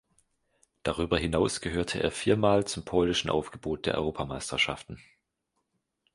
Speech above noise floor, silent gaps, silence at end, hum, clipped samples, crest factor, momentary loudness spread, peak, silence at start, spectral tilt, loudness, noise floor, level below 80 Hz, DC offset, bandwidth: 52 dB; none; 1.15 s; none; under 0.1%; 20 dB; 10 LU; -10 dBFS; 0.85 s; -4.5 dB/octave; -29 LUFS; -80 dBFS; -48 dBFS; under 0.1%; 11.5 kHz